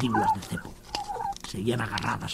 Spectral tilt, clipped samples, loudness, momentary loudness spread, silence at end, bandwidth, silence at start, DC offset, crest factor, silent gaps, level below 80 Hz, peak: -5 dB/octave; under 0.1%; -30 LUFS; 10 LU; 0 s; 16 kHz; 0 s; under 0.1%; 18 dB; none; -50 dBFS; -12 dBFS